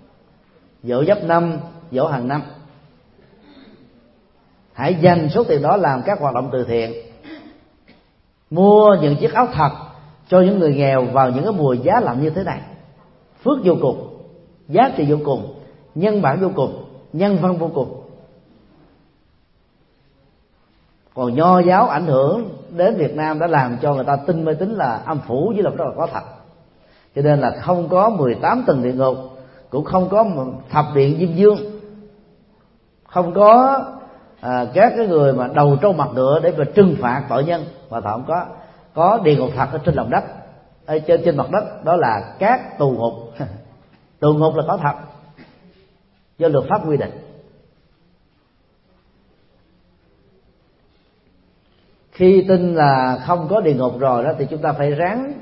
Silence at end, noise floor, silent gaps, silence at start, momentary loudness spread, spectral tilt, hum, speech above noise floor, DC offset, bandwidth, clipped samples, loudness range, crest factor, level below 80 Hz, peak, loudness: 0 s; -59 dBFS; none; 0.85 s; 13 LU; -12 dB/octave; none; 43 dB; under 0.1%; 5.8 kHz; under 0.1%; 7 LU; 18 dB; -52 dBFS; 0 dBFS; -17 LUFS